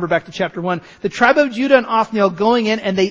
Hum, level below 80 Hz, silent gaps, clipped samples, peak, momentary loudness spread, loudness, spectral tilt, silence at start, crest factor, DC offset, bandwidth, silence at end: none; -54 dBFS; none; under 0.1%; 0 dBFS; 10 LU; -16 LUFS; -5.5 dB/octave; 0 s; 16 dB; under 0.1%; 8 kHz; 0 s